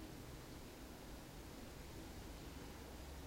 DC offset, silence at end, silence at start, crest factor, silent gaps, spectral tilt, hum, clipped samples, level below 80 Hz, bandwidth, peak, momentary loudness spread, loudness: under 0.1%; 0 s; 0 s; 12 dB; none; -4.5 dB/octave; none; under 0.1%; -58 dBFS; 16 kHz; -40 dBFS; 1 LU; -54 LUFS